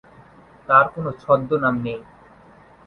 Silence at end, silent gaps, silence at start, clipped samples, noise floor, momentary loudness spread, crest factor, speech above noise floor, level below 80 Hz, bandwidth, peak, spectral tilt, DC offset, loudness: 0.85 s; none; 0.7 s; under 0.1%; -49 dBFS; 16 LU; 22 dB; 30 dB; -56 dBFS; 5.6 kHz; 0 dBFS; -9 dB/octave; under 0.1%; -19 LUFS